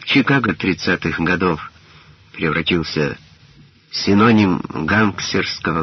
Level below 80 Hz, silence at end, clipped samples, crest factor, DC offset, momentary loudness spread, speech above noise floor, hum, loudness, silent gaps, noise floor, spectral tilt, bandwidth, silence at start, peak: -46 dBFS; 0 s; under 0.1%; 18 dB; under 0.1%; 11 LU; 31 dB; none; -17 LUFS; none; -48 dBFS; -4 dB/octave; 6.4 kHz; 0 s; -2 dBFS